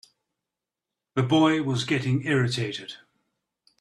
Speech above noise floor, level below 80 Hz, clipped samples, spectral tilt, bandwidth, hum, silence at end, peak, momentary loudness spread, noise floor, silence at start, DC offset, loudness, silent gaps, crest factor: 64 dB; -62 dBFS; under 0.1%; -6 dB/octave; 11.5 kHz; none; 0.85 s; -8 dBFS; 11 LU; -87 dBFS; 1.15 s; under 0.1%; -24 LUFS; none; 18 dB